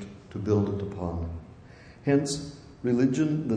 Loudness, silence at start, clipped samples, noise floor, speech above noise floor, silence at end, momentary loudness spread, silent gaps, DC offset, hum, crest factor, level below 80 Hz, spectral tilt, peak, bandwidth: -28 LUFS; 0 s; under 0.1%; -49 dBFS; 23 dB; 0 s; 16 LU; none; under 0.1%; none; 16 dB; -50 dBFS; -6.5 dB/octave; -12 dBFS; 10.5 kHz